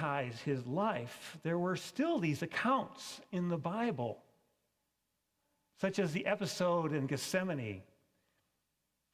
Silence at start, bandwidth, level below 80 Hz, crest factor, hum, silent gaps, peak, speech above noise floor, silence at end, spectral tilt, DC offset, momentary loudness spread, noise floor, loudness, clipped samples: 0 s; 16 kHz; -74 dBFS; 18 dB; none; none; -18 dBFS; 48 dB; 1.3 s; -5.5 dB/octave; under 0.1%; 9 LU; -84 dBFS; -36 LUFS; under 0.1%